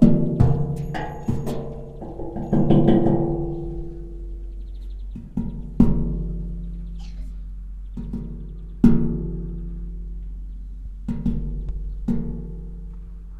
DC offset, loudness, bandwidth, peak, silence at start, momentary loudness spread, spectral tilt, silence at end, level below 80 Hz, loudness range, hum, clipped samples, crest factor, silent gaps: under 0.1%; -24 LUFS; 8.6 kHz; -2 dBFS; 0 s; 19 LU; -10 dB/octave; 0 s; -30 dBFS; 8 LU; none; under 0.1%; 22 dB; none